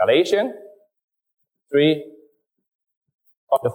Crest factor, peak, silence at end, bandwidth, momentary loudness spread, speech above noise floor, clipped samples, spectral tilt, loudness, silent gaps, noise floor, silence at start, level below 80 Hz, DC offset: 18 dB; -6 dBFS; 0 s; 16 kHz; 11 LU; 40 dB; under 0.1%; -5.5 dB/octave; -20 LUFS; 1.04-1.08 s, 2.75-2.79 s, 2.97-3.01 s, 3.37-3.47 s; -58 dBFS; 0 s; -72 dBFS; under 0.1%